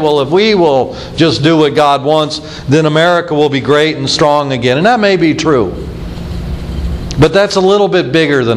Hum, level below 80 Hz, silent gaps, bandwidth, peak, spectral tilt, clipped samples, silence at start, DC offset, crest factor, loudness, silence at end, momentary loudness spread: none; -28 dBFS; none; 12.5 kHz; 0 dBFS; -5.5 dB/octave; 0.3%; 0 s; under 0.1%; 10 dB; -10 LUFS; 0 s; 12 LU